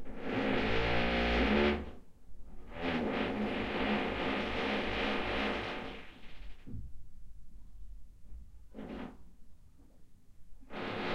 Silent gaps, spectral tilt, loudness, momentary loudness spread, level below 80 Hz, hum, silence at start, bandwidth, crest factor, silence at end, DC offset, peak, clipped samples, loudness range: none; -6 dB/octave; -34 LUFS; 24 LU; -46 dBFS; none; 0 s; 11 kHz; 18 dB; 0 s; under 0.1%; -18 dBFS; under 0.1%; 19 LU